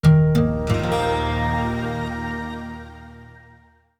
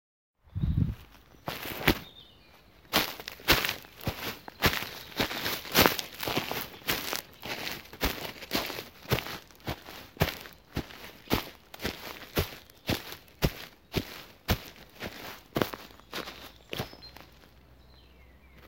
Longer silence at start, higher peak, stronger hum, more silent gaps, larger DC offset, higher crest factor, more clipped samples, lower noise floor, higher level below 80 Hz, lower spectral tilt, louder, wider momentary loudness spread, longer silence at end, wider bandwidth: second, 0.05 s vs 0.55 s; about the same, -4 dBFS vs -2 dBFS; neither; neither; neither; second, 18 dB vs 32 dB; neither; second, -53 dBFS vs -57 dBFS; first, -34 dBFS vs -46 dBFS; first, -7.5 dB/octave vs -3.5 dB/octave; first, -22 LUFS vs -32 LUFS; first, 20 LU vs 17 LU; first, 0.75 s vs 0 s; second, 11.5 kHz vs 17 kHz